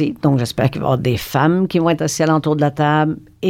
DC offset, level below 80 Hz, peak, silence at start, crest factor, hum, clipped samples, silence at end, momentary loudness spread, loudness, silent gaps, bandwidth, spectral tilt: under 0.1%; -46 dBFS; -2 dBFS; 0 s; 16 dB; none; under 0.1%; 0 s; 3 LU; -17 LUFS; none; 16.5 kHz; -6 dB/octave